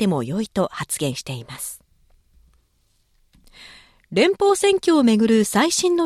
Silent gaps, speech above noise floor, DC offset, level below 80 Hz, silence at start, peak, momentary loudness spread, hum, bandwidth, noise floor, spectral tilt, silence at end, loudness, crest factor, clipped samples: none; 45 dB; under 0.1%; -56 dBFS; 0 s; -4 dBFS; 15 LU; none; 15 kHz; -64 dBFS; -4.5 dB/octave; 0 s; -19 LUFS; 16 dB; under 0.1%